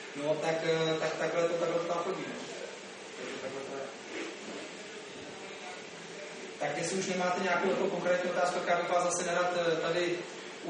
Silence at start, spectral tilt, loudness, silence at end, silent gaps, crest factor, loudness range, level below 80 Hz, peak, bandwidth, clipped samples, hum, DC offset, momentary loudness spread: 0 s; -3.5 dB/octave; -33 LUFS; 0 s; none; 16 dB; 11 LU; -78 dBFS; -18 dBFS; 9.6 kHz; under 0.1%; none; under 0.1%; 14 LU